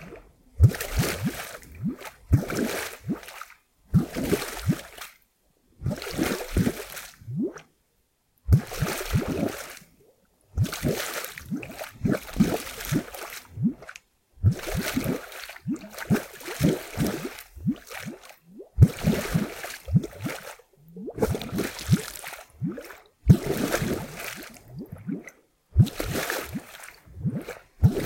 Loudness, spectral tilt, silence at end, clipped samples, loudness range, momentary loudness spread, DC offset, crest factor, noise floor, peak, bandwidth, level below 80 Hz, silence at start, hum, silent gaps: -28 LUFS; -6 dB/octave; 0 s; under 0.1%; 4 LU; 18 LU; under 0.1%; 26 dB; -70 dBFS; -2 dBFS; 17 kHz; -40 dBFS; 0 s; none; none